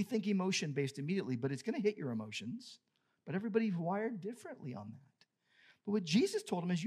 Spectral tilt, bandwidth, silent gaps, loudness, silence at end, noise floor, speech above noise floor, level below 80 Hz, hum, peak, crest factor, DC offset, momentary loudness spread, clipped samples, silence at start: -5.5 dB/octave; 14 kHz; none; -37 LUFS; 0 s; -73 dBFS; 36 dB; under -90 dBFS; none; -20 dBFS; 18 dB; under 0.1%; 15 LU; under 0.1%; 0 s